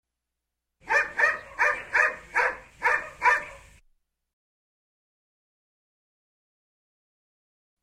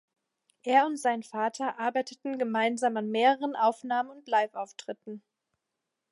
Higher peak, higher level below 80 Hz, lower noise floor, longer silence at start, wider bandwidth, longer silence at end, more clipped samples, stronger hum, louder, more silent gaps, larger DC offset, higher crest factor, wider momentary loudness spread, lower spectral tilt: about the same, -8 dBFS vs -10 dBFS; first, -62 dBFS vs -88 dBFS; about the same, -85 dBFS vs -85 dBFS; first, 0.85 s vs 0.65 s; first, 15 kHz vs 11.5 kHz; first, 4.25 s vs 0.95 s; neither; neither; first, -24 LUFS vs -28 LUFS; neither; neither; about the same, 22 dB vs 20 dB; second, 4 LU vs 15 LU; second, -1.5 dB/octave vs -4 dB/octave